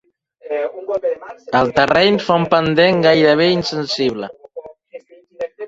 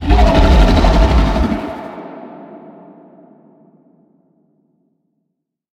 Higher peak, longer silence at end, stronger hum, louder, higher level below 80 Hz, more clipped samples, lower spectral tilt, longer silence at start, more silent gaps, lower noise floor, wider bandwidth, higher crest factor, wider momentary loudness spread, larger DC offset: about the same, -2 dBFS vs 0 dBFS; second, 0 s vs 3.15 s; neither; about the same, -15 LUFS vs -13 LUFS; second, -52 dBFS vs -18 dBFS; neither; second, -5.5 dB/octave vs -7 dB/octave; first, 0.45 s vs 0 s; neither; second, -40 dBFS vs -73 dBFS; second, 7.8 kHz vs 8.6 kHz; about the same, 16 dB vs 14 dB; second, 17 LU vs 24 LU; neither